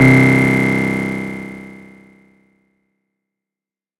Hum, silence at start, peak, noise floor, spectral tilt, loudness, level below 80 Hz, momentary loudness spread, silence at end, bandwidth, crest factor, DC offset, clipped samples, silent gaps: none; 0 s; 0 dBFS; -90 dBFS; -7 dB/octave; -14 LUFS; -46 dBFS; 23 LU; 2.25 s; 14 kHz; 16 dB; under 0.1%; under 0.1%; none